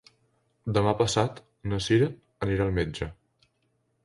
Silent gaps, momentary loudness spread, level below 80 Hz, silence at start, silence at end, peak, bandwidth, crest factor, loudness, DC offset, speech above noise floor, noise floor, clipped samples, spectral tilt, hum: none; 13 LU; -46 dBFS; 0.65 s; 0.9 s; -8 dBFS; 11.5 kHz; 22 dB; -27 LUFS; under 0.1%; 47 dB; -73 dBFS; under 0.1%; -5.5 dB/octave; none